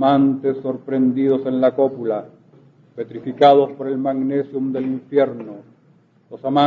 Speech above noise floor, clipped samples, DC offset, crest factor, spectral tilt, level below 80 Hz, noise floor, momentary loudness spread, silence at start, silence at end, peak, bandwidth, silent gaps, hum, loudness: 37 dB; under 0.1%; under 0.1%; 18 dB; -8.5 dB/octave; -68 dBFS; -55 dBFS; 15 LU; 0 s; 0 s; -2 dBFS; 4.9 kHz; none; none; -19 LUFS